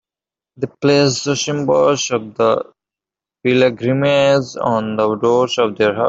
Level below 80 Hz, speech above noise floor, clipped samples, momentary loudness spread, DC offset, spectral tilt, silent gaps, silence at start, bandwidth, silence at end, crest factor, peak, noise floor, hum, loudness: -58 dBFS; 74 dB; under 0.1%; 7 LU; under 0.1%; -4.5 dB/octave; none; 0.6 s; 8 kHz; 0 s; 16 dB; -2 dBFS; -89 dBFS; none; -16 LUFS